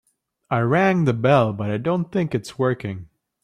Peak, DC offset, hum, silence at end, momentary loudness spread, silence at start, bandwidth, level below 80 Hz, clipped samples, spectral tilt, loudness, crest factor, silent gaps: -4 dBFS; under 0.1%; none; 0.4 s; 9 LU; 0.5 s; 12 kHz; -58 dBFS; under 0.1%; -7.5 dB/octave; -21 LUFS; 18 dB; none